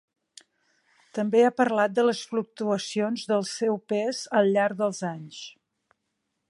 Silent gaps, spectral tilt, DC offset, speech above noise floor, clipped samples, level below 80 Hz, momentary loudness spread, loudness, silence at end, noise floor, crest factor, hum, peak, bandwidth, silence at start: none; -5 dB/octave; under 0.1%; 54 dB; under 0.1%; -80 dBFS; 13 LU; -25 LUFS; 1 s; -79 dBFS; 18 dB; none; -8 dBFS; 11.5 kHz; 1.15 s